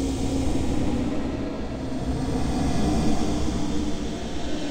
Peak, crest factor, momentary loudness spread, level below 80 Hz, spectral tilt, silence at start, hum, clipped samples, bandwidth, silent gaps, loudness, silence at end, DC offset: -10 dBFS; 14 dB; 7 LU; -32 dBFS; -6 dB/octave; 0 s; none; under 0.1%; 15 kHz; none; -27 LUFS; 0 s; under 0.1%